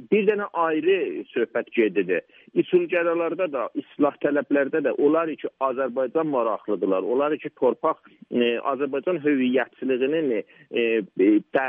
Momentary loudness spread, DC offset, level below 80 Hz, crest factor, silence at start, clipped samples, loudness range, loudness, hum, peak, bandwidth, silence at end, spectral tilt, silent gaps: 6 LU; under 0.1%; -76 dBFS; 16 dB; 0 s; under 0.1%; 1 LU; -24 LUFS; none; -8 dBFS; 3.7 kHz; 0 s; -9 dB/octave; none